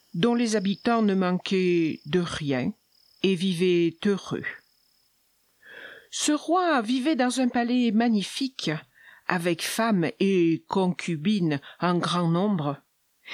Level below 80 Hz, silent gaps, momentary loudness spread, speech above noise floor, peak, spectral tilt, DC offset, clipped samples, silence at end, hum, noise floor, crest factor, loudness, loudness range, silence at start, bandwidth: -66 dBFS; none; 10 LU; 43 dB; -6 dBFS; -5.5 dB/octave; under 0.1%; under 0.1%; 0 s; none; -67 dBFS; 20 dB; -25 LUFS; 3 LU; 0.15 s; 15.5 kHz